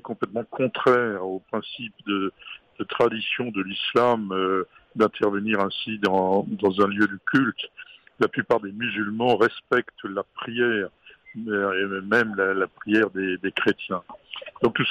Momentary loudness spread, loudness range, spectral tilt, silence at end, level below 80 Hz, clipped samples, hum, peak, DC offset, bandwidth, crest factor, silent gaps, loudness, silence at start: 12 LU; 2 LU; -6.5 dB/octave; 0 s; -66 dBFS; under 0.1%; none; -8 dBFS; under 0.1%; 10.5 kHz; 16 dB; none; -24 LUFS; 0.05 s